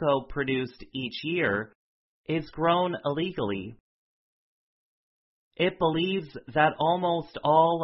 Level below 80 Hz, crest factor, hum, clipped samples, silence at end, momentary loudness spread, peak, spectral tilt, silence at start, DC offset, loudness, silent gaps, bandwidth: -58 dBFS; 20 dB; none; under 0.1%; 0 s; 11 LU; -8 dBFS; -9.5 dB/octave; 0 s; under 0.1%; -27 LUFS; 1.75-2.24 s, 3.80-5.51 s; 5.8 kHz